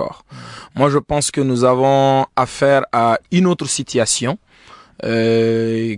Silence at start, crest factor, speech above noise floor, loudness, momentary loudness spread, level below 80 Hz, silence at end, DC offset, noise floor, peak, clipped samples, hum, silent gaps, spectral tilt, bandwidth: 0 s; 14 dB; 20 dB; -16 LUFS; 14 LU; -48 dBFS; 0 s; under 0.1%; -36 dBFS; -2 dBFS; under 0.1%; none; none; -5 dB/octave; 11 kHz